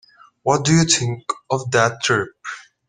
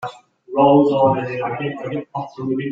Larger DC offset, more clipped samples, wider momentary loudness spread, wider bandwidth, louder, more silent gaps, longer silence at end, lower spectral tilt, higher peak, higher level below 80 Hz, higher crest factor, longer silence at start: neither; neither; about the same, 14 LU vs 14 LU; first, 10 kHz vs 7.4 kHz; about the same, -18 LUFS vs -18 LUFS; neither; first, 0.25 s vs 0 s; second, -4 dB/octave vs -8.5 dB/octave; about the same, 0 dBFS vs -2 dBFS; first, -54 dBFS vs -60 dBFS; about the same, 20 dB vs 16 dB; first, 0.45 s vs 0 s